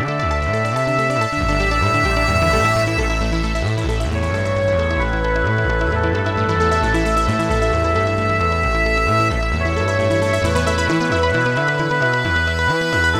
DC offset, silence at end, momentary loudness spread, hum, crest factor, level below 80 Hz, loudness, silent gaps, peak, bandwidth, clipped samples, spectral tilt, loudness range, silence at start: under 0.1%; 0 s; 4 LU; none; 14 dB; -26 dBFS; -18 LUFS; none; -4 dBFS; 16 kHz; under 0.1%; -5.5 dB/octave; 1 LU; 0 s